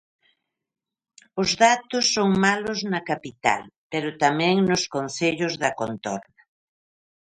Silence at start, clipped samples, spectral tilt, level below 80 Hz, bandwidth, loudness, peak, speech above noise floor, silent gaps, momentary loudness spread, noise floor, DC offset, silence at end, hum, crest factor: 1.35 s; under 0.1%; -4 dB/octave; -60 dBFS; 10.5 kHz; -23 LUFS; -4 dBFS; 46 dB; 3.76-3.90 s; 11 LU; -69 dBFS; under 0.1%; 1 s; none; 22 dB